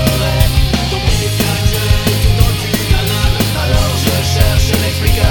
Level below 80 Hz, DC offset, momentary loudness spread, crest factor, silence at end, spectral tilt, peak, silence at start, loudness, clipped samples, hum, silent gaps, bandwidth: -16 dBFS; under 0.1%; 2 LU; 12 dB; 0 s; -4.5 dB/octave; 0 dBFS; 0 s; -13 LUFS; under 0.1%; none; none; over 20 kHz